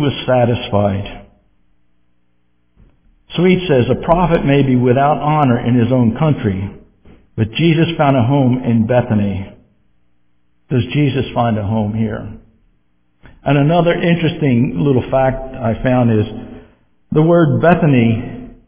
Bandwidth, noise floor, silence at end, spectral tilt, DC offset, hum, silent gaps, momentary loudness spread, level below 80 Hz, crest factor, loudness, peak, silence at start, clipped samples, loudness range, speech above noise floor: 3.6 kHz; -63 dBFS; 0.15 s; -11.5 dB/octave; under 0.1%; 60 Hz at -40 dBFS; none; 11 LU; -38 dBFS; 16 dB; -14 LUFS; 0 dBFS; 0 s; under 0.1%; 6 LU; 50 dB